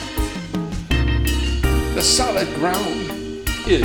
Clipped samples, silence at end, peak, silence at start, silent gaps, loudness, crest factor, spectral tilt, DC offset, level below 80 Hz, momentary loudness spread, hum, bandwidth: under 0.1%; 0 s; -2 dBFS; 0 s; none; -20 LUFS; 16 dB; -4 dB/octave; under 0.1%; -24 dBFS; 11 LU; none; 19 kHz